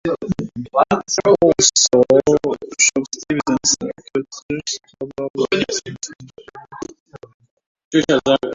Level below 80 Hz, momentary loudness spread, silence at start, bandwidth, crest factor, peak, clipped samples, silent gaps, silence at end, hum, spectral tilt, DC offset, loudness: -50 dBFS; 19 LU; 0.05 s; 8 kHz; 18 dB; 0 dBFS; under 0.1%; 4.42-4.49 s, 5.30-5.34 s, 7.00-7.06 s, 7.34-7.40 s, 7.51-7.57 s, 7.66-7.75 s, 7.85-7.91 s; 0 s; none; -3 dB/octave; under 0.1%; -17 LUFS